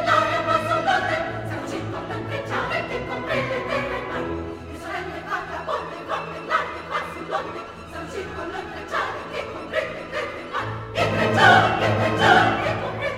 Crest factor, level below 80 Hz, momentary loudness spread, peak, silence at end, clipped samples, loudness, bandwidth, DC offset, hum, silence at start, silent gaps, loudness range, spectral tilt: 22 dB; -48 dBFS; 15 LU; -2 dBFS; 0 s; under 0.1%; -23 LUFS; 15.5 kHz; under 0.1%; none; 0 s; none; 10 LU; -5 dB/octave